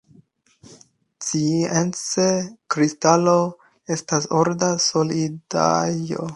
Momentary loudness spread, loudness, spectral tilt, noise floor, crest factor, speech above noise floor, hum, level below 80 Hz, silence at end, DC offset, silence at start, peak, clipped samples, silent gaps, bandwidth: 9 LU; -21 LUFS; -4.5 dB/octave; -55 dBFS; 20 dB; 35 dB; none; -62 dBFS; 0 s; under 0.1%; 0.7 s; -2 dBFS; under 0.1%; none; 11.5 kHz